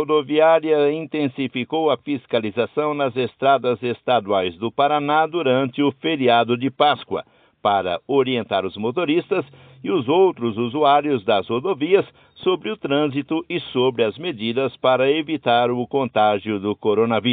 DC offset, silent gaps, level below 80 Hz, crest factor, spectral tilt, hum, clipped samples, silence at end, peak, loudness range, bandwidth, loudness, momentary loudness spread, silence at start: under 0.1%; none; -66 dBFS; 18 dB; -3.5 dB/octave; none; under 0.1%; 0 s; -2 dBFS; 2 LU; 4.7 kHz; -20 LUFS; 8 LU; 0 s